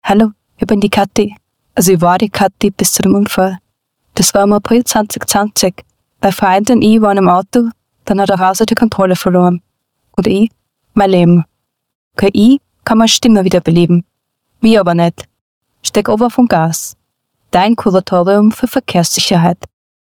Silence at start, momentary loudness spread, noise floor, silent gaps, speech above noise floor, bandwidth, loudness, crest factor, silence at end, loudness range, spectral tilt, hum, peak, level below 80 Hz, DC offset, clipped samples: 0.05 s; 8 LU; -65 dBFS; 11.95-12.11 s, 15.41-15.61 s; 55 dB; 19 kHz; -11 LUFS; 12 dB; 0.4 s; 2 LU; -5 dB/octave; none; 0 dBFS; -42 dBFS; 0.2%; under 0.1%